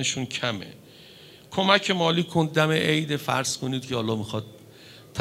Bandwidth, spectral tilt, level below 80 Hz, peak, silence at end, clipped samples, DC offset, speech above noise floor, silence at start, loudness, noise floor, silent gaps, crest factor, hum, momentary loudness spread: 16 kHz; -4 dB/octave; -64 dBFS; -2 dBFS; 0 s; under 0.1%; under 0.1%; 24 dB; 0 s; -24 LUFS; -49 dBFS; none; 24 dB; none; 14 LU